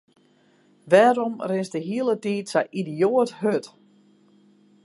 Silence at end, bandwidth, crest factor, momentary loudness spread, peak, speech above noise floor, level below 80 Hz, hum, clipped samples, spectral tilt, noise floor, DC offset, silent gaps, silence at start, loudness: 1.2 s; 11.5 kHz; 20 dB; 10 LU; -4 dBFS; 38 dB; -78 dBFS; none; under 0.1%; -6 dB/octave; -60 dBFS; under 0.1%; none; 0.85 s; -23 LUFS